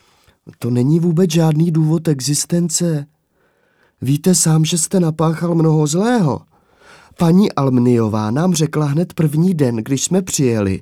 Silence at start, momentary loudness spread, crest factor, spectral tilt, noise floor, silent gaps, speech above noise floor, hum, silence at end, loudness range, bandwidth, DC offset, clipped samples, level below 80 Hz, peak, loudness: 0.45 s; 5 LU; 14 dB; -5.5 dB/octave; -60 dBFS; none; 46 dB; none; 0 s; 1 LU; 15.5 kHz; under 0.1%; under 0.1%; -56 dBFS; -2 dBFS; -16 LUFS